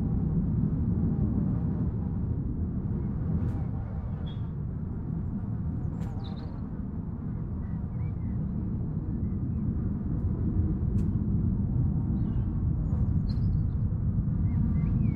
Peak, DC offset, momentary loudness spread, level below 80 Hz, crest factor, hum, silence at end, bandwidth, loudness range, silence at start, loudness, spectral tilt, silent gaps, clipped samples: -16 dBFS; under 0.1%; 7 LU; -36 dBFS; 12 dB; none; 0 s; 4.6 kHz; 6 LU; 0 s; -30 LUFS; -11.5 dB/octave; none; under 0.1%